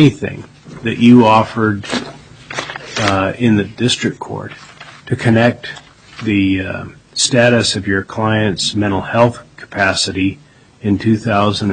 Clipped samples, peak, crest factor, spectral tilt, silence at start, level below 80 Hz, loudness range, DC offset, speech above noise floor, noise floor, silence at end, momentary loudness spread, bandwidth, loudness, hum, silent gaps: under 0.1%; 0 dBFS; 16 dB; -5 dB/octave; 0 s; -48 dBFS; 4 LU; under 0.1%; 19 dB; -33 dBFS; 0 s; 16 LU; 9.4 kHz; -15 LUFS; none; none